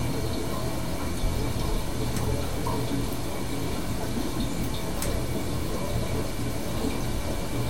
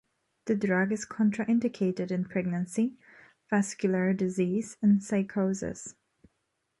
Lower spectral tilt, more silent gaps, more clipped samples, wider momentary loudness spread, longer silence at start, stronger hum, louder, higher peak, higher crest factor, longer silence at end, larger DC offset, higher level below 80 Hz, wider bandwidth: second, -5 dB/octave vs -6.5 dB/octave; neither; neither; second, 2 LU vs 7 LU; second, 0 s vs 0.45 s; neither; about the same, -30 LUFS vs -29 LUFS; about the same, -14 dBFS vs -14 dBFS; about the same, 14 dB vs 16 dB; second, 0 s vs 0.9 s; first, 3% vs under 0.1%; first, -34 dBFS vs -66 dBFS; first, 16.5 kHz vs 11.5 kHz